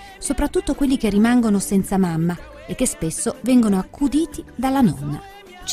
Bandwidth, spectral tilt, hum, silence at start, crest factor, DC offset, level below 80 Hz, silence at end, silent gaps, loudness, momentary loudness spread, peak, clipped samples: 15.5 kHz; -5.5 dB/octave; none; 0 s; 14 dB; under 0.1%; -38 dBFS; 0 s; none; -20 LUFS; 13 LU; -6 dBFS; under 0.1%